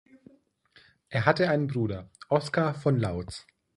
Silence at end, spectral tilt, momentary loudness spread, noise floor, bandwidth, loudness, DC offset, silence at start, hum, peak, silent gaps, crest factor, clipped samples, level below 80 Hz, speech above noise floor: 0.35 s; -7 dB/octave; 14 LU; -61 dBFS; 11.5 kHz; -27 LUFS; under 0.1%; 1.1 s; none; -4 dBFS; none; 24 dB; under 0.1%; -54 dBFS; 35 dB